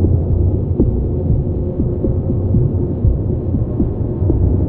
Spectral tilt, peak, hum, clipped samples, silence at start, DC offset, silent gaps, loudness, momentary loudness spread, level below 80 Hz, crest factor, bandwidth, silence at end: -14.5 dB/octave; 0 dBFS; none; under 0.1%; 0 s; under 0.1%; none; -17 LUFS; 3 LU; -22 dBFS; 14 dB; 1.7 kHz; 0 s